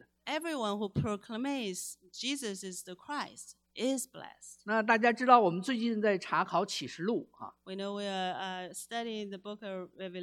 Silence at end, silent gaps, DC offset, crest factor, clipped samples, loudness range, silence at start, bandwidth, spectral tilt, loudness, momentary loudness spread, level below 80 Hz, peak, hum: 0 s; none; under 0.1%; 24 dB; under 0.1%; 9 LU; 0.25 s; 16.5 kHz; -4 dB/octave; -33 LUFS; 16 LU; -68 dBFS; -8 dBFS; none